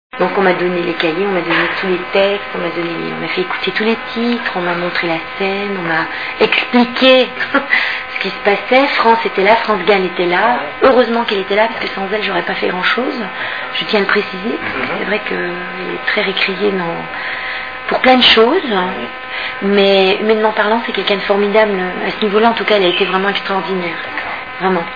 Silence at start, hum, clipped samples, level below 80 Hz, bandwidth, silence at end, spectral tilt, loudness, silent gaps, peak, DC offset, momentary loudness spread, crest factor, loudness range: 0.15 s; none; under 0.1%; -50 dBFS; 5.4 kHz; 0 s; -6 dB/octave; -14 LUFS; none; 0 dBFS; 0.8%; 9 LU; 14 dB; 5 LU